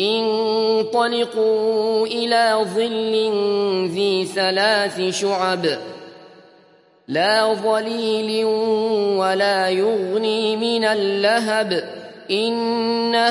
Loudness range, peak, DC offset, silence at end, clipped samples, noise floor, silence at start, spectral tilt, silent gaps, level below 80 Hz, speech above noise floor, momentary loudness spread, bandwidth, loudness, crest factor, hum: 3 LU; -4 dBFS; under 0.1%; 0 s; under 0.1%; -53 dBFS; 0 s; -4 dB/octave; none; -74 dBFS; 34 dB; 4 LU; 11.5 kHz; -19 LUFS; 16 dB; none